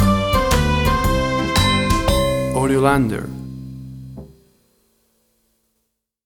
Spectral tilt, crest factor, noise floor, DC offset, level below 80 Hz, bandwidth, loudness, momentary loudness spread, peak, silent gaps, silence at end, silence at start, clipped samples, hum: -5 dB/octave; 18 dB; -73 dBFS; under 0.1%; -28 dBFS; over 20 kHz; -17 LUFS; 19 LU; -2 dBFS; none; 2 s; 0 s; under 0.1%; none